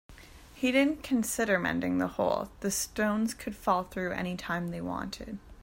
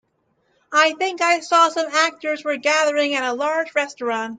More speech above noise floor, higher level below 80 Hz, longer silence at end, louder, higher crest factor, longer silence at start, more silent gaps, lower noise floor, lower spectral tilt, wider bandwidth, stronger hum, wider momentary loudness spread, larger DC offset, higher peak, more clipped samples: second, 21 dB vs 47 dB; first, -54 dBFS vs -74 dBFS; about the same, 0 s vs 0 s; second, -30 LUFS vs -19 LUFS; about the same, 18 dB vs 16 dB; second, 0.1 s vs 0.7 s; neither; second, -51 dBFS vs -67 dBFS; first, -4.5 dB/octave vs -1 dB/octave; first, 16.5 kHz vs 9.6 kHz; neither; about the same, 8 LU vs 7 LU; neither; second, -12 dBFS vs -4 dBFS; neither